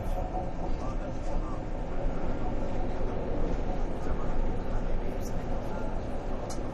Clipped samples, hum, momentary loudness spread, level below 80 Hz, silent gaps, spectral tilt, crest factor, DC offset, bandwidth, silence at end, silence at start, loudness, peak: under 0.1%; none; 3 LU; -32 dBFS; none; -7 dB/octave; 12 dB; under 0.1%; 7.4 kHz; 0 s; 0 s; -35 LUFS; -16 dBFS